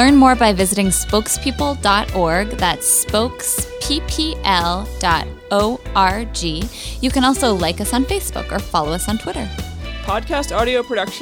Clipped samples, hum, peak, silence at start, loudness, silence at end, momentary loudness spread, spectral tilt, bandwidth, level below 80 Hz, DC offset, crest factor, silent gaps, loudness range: under 0.1%; none; -2 dBFS; 0 s; -17 LUFS; 0 s; 9 LU; -3.5 dB/octave; 18.5 kHz; -30 dBFS; under 0.1%; 16 dB; none; 4 LU